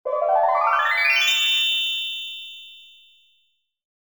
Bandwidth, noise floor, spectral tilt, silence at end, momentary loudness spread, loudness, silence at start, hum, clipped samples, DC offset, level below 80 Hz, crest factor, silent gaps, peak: 19.5 kHz; -69 dBFS; 4 dB/octave; 1.2 s; 17 LU; -19 LUFS; 0.05 s; none; under 0.1%; 0.1%; -82 dBFS; 16 dB; none; -8 dBFS